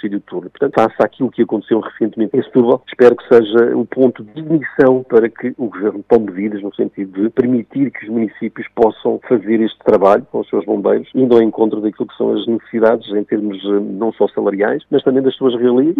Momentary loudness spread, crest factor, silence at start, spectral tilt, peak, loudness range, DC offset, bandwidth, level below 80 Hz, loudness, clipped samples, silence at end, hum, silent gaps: 9 LU; 14 dB; 0.05 s; -8.5 dB/octave; 0 dBFS; 4 LU; under 0.1%; 6.2 kHz; -58 dBFS; -15 LUFS; 0.3%; 0 s; none; none